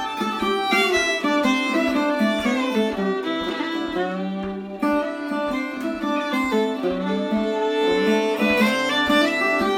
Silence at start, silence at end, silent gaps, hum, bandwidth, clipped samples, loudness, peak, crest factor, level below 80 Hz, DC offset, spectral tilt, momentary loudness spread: 0 s; 0 s; none; none; 17 kHz; under 0.1%; -21 LUFS; -4 dBFS; 16 dB; -52 dBFS; under 0.1%; -4.5 dB/octave; 8 LU